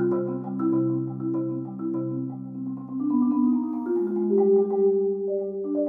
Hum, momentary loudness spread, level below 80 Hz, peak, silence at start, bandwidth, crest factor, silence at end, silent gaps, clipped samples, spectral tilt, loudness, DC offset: none; 11 LU; -72 dBFS; -12 dBFS; 0 s; 2.1 kHz; 12 dB; 0 s; none; under 0.1%; -13.5 dB/octave; -25 LUFS; under 0.1%